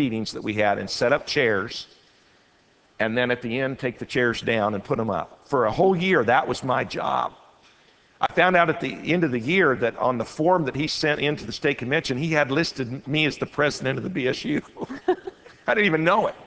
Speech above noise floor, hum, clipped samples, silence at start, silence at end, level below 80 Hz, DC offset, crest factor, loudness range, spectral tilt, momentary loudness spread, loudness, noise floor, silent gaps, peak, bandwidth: 36 dB; none; under 0.1%; 0 s; 0 s; -56 dBFS; under 0.1%; 20 dB; 3 LU; -5.5 dB/octave; 9 LU; -23 LUFS; -60 dBFS; none; -2 dBFS; 8 kHz